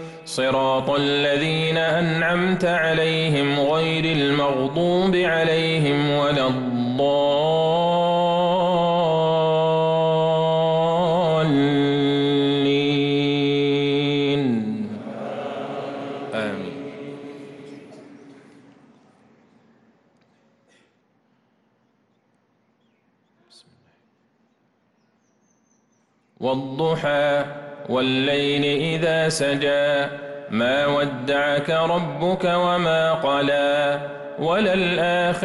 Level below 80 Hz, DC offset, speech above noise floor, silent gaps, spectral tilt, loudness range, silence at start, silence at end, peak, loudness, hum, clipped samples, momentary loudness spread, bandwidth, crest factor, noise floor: -58 dBFS; under 0.1%; 45 dB; none; -6 dB/octave; 11 LU; 0 s; 0 s; -10 dBFS; -20 LUFS; none; under 0.1%; 11 LU; 11.5 kHz; 12 dB; -65 dBFS